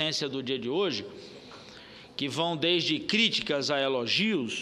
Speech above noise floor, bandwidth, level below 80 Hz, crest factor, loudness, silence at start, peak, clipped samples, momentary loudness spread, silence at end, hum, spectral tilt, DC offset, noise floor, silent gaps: 20 dB; 13 kHz; -68 dBFS; 18 dB; -27 LUFS; 0 s; -10 dBFS; under 0.1%; 22 LU; 0 s; none; -3.5 dB/octave; under 0.1%; -49 dBFS; none